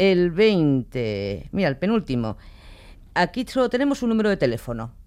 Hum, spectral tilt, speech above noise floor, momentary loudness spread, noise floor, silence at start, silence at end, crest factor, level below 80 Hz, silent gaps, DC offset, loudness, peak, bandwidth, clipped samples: none; -7 dB/octave; 23 dB; 10 LU; -44 dBFS; 0 s; 0.05 s; 16 dB; -44 dBFS; none; under 0.1%; -22 LUFS; -6 dBFS; 15 kHz; under 0.1%